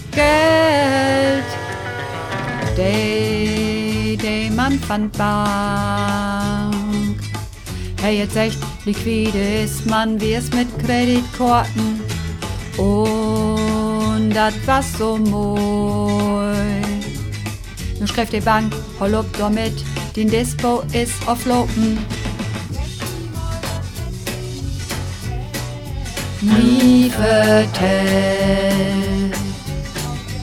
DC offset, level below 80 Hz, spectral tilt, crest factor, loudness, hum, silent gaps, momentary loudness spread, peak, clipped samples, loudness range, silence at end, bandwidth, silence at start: under 0.1%; -32 dBFS; -5.5 dB/octave; 16 dB; -19 LUFS; none; none; 12 LU; -2 dBFS; under 0.1%; 6 LU; 0 s; 17 kHz; 0 s